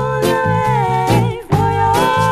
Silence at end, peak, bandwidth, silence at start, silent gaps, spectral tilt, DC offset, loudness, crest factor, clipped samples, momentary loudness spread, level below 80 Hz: 0 s; 0 dBFS; 15.5 kHz; 0 s; none; -6 dB/octave; under 0.1%; -15 LUFS; 14 dB; under 0.1%; 3 LU; -36 dBFS